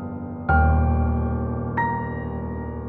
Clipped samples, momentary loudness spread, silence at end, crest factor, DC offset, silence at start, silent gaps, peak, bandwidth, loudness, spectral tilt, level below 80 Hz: under 0.1%; 11 LU; 0 s; 16 dB; under 0.1%; 0 s; none; -6 dBFS; 3 kHz; -24 LUFS; -11.5 dB/octave; -28 dBFS